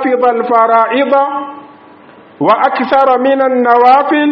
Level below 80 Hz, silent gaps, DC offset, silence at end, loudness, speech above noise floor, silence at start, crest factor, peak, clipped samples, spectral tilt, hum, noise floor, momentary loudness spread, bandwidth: -60 dBFS; none; under 0.1%; 0 s; -10 LUFS; 29 dB; 0 s; 10 dB; 0 dBFS; 0.1%; -7 dB/octave; none; -38 dBFS; 7 LU; 5.8 kHz